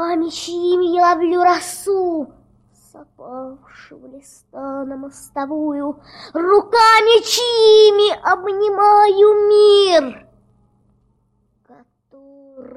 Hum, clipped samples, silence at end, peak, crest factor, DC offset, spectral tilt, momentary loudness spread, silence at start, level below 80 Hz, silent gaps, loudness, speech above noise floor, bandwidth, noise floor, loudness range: none; under 0.1%; 0.15 s; -2 dBFS; 14 dB; under 0.1%; -2 dB/octave; 21 LU; 0 s; -58 dBFS; none; -14 LUFS; 48 dB; 14.5 kHz; -63 dBFS; 16 LU